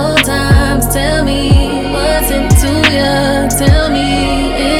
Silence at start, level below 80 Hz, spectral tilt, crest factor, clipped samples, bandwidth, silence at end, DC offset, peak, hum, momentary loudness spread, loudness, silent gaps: 0 s; -18 dBFS; -4.5 dB/octave; 10 dB; under 0.1%; 17 kHz; 0 s; under 0.1%; 0 dBFS; none; 3 LU; -11 LUFS; none